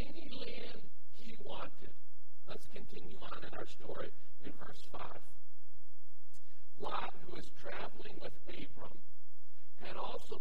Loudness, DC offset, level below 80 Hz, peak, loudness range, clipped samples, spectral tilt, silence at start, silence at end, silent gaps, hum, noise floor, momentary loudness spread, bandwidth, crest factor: -49 LUFS; 6%; -66 dBFS; -20 dBFS; 3 LU; under 0.1%; -6 dB/octave; 0 s; 0 s; none; none; -72 dBFS; 19 LU; 16.5 kHz; 24 dB